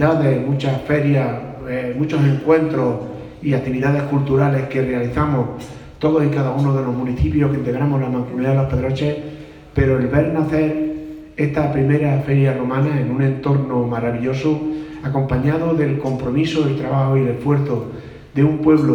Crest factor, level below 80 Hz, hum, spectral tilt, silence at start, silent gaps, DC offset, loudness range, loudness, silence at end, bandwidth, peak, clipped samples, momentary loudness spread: 16 dB; -38 dBFS; none; -9 dB/octave; 0 s; none; under 0.1%; 1 LU; -19 LUFS; 0 s; 7 kHz; -2 dBFS; under 0.1%; 9 LU